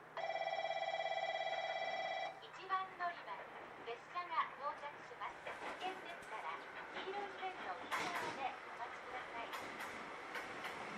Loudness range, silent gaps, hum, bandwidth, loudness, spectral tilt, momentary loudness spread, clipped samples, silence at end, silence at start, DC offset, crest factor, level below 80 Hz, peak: 4 LU; none; none; 14.5 kHz; -44 LUFS; -2.5 dB/octave; 8 LU; under 0.1%; 0 s; 0 s; under 0.1%; 20 dB; -82 dBFS; -24 dBFS